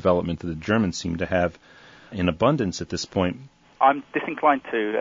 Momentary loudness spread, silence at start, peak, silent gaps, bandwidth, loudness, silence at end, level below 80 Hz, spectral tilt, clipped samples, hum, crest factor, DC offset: 9 LU; 0 s; -6 dBFS; none; 7.8 kHz; -24 LUFS; 0 s; -50 dBFS; -5.5 dB/octave; under 0.1%; none; 18 dB; under 0.1%